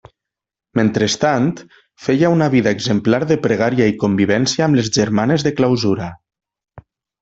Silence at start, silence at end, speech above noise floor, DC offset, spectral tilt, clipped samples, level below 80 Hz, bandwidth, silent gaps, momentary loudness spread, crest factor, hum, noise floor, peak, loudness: 0.75 s; 0.4 s; 70 dB; under 0.1%; -5.5 dB/octave; under 0.1%; -52 dBFS; 8.2 kHz; none; 6 LU; 14 dB; none; -85 dBFS; -2 dBFS; -16 LUFS